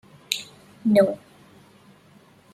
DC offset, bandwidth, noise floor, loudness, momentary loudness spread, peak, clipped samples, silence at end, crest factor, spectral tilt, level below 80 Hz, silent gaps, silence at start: under 0.1%; 14 kHz; -54 dBFS; -23 LUFS; 18 LU; -2 dBFS; under 0.1%; 1.4 s; 24 dB; -5 dB/octave; -68 dBFS; none; 0.3 s